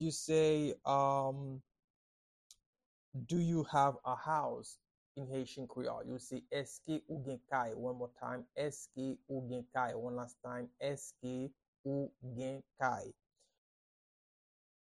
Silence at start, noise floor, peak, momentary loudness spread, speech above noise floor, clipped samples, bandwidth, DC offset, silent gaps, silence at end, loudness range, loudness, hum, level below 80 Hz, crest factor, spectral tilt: 0 s; under -90 dBFS; -18 dBFS; 13 LU; over 51 dB; under 0.1%; 12.5 kHz; under 0.1%; 1.84-2.50 s, 2.66-2.73 s, 2.86-3.12 s, 4.91-5.15 s, 11.68-11.73 s, 11.79-11.84 s; 1.75 s; 5 LU; -39 LUFS; none; -74 dBFS; 22 dB; -5.5 dB/octave